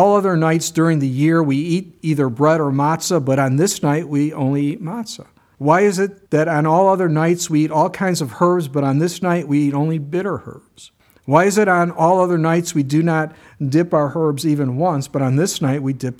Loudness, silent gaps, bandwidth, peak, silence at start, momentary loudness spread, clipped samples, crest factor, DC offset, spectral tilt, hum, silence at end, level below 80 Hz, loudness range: -17 LUFS; none; 15.5 kHz; 0 dBFS; 0 s; 8 LU; under 0.1%; 16 dB; under 0.1%; -6 dB/octave; none; 0.05 s; -60 dBFS; 2 LU